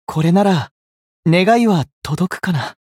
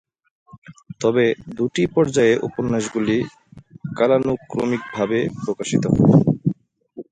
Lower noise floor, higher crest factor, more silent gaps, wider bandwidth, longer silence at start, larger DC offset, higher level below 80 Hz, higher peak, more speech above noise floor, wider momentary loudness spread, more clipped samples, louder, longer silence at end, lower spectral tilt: first, under -90 dBFS vs -40 dBFS; about the same, 14 dB vs 18 dB; first, 0.71-1.23 s, 1.93-2.02 s vs 0.58-0.62 s; first, 15 kHz vs 9.4 kHz; second, 0.1 s vs 0.55 s; neither; about the same, -52 dBFS vs -50 dBFS; about the same, -2 dBFS vs -2 dBFS; first, over 75 dB vs 21 dB; about the same, 10 LU vs 10 LU; neither; first, -16 LUFS vs -20 LUFS; about the same, 0.2 s vs 0.1 s; about the same, -6.5 dB/octave vs -6.5 dB/octave